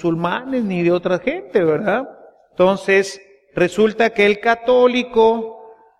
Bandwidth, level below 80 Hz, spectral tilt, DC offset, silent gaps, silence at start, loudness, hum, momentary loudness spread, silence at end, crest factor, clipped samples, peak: 12 kHz; -52 dBFS; -6 dB/octave; under 0.1%; none; 0 s; -17 LUFS; none; 12 LU; 0.25 s; 16 dB; under 0.1%; -2 dBFS